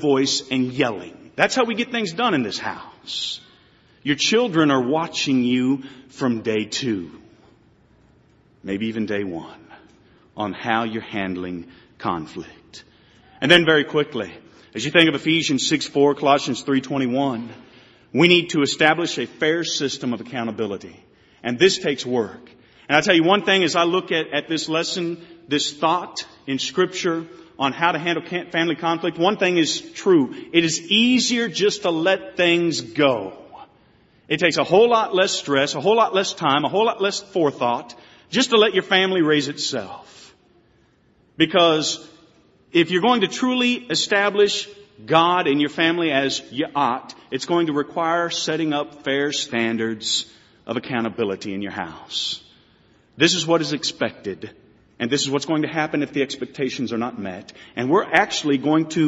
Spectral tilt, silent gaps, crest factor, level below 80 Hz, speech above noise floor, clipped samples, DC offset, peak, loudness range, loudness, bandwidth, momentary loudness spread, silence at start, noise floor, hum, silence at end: -2.5 dB/octave; none; 22 dB; -62 dBFS; 38 dB; under 0.1%; under 0.1%; 0 dBFS; 7 LU; -20 LUFS; 8 kHz; 13 LU; 0 s; -59 dBFS; none; 0 s